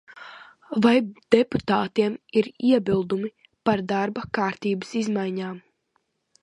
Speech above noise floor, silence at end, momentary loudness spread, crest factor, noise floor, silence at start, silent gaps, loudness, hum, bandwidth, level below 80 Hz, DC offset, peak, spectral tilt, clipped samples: 49 dB; 0.85 s; 13 LU; 22 dB; -72 dBFS; 0.15 s; none; -24 LUFS; none; 11 kHz; -60 dBFS; under 0.1%; -2 dBFS; -6.5 dB/octave; under 0.1%